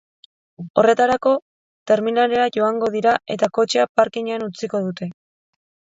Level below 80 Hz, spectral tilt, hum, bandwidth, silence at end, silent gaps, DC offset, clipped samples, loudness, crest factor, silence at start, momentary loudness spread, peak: -62 dBFS; -5 dB/octave; none; 7.8 kHz; 0.8 s; 0.70-0.74 s, 1.42-1.86 s, 3.89-3.95 s; under 0.1%; under 0.1%; -19 LUFS; 20 dB; 0.6 s; 9 LU; 0 dBFS